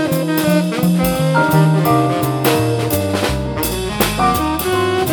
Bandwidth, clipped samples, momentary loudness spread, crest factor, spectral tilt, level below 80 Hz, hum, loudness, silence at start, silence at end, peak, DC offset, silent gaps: 19.5 kHz; under 0.1%; 6 LU; 14 dB; -5.5 dB/octave; -34 dBFS; none; -16 LUFS; 0 s; 0 s; -2 dBFS; under 0.1%; none